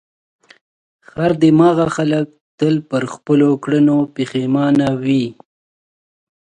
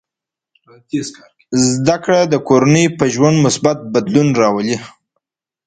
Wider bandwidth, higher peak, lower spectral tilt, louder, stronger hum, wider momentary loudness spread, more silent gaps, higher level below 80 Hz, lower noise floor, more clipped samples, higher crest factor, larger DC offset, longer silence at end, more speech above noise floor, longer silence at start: about the same, 9.6 kHz vs 9.6 kHz; about the same, 0 dBFS vs 0 dBFS; first, -7.5 dB/octave vs -5.5 dB/octave; about the same, -16 LUFS vs -14 LUFS; neither; about the same, 9 LU vs 11 LU; first, 2.41-2.58 s vs none; about the same, -54 dBFS vs -52 dBFS; first, under -90 dBFS vs -85 dBFS; neither; about the same, 16 dB vs 16 dB; neither; first, 1.15 s vs 0.75 s; first, over 75 dB vs 71 dB; first, 1.15 s vs 0.95 s